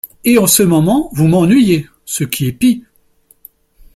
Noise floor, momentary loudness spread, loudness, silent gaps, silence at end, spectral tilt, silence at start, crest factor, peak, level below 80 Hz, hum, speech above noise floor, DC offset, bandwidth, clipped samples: -52 dBFS; 10 LU; -12 LUFS; none; 1.15 s; -5 dB/octave; 0.05 s; 14 dB; 0 dBFS; -44 dBFS; none; 41 dB; under 0.1%; 16.5 kHz; under 0.1%